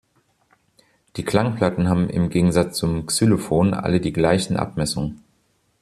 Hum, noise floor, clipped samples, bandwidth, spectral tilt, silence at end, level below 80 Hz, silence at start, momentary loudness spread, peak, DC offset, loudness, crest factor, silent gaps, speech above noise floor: none; -65 dBFS; under 0.1%; 14 kHz; -6 dB/octave; 0.65 s; -46 dBFS; 1.15 s; 6 LU; -4 dBFS; under 0.1%; -21 LUFS; 18 dB; none; 45 dB